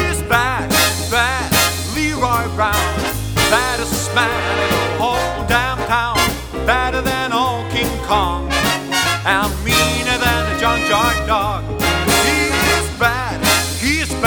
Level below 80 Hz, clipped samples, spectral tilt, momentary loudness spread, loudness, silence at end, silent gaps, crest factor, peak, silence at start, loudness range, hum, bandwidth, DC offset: -28 dBFS; under 0.1%; -3 dB/octave; 4 LU; -16 LUFS; 0 s; none; 16 dB; 0 dBFS; 0 s; 2 LU; none; over 20 kHz; under 0.1%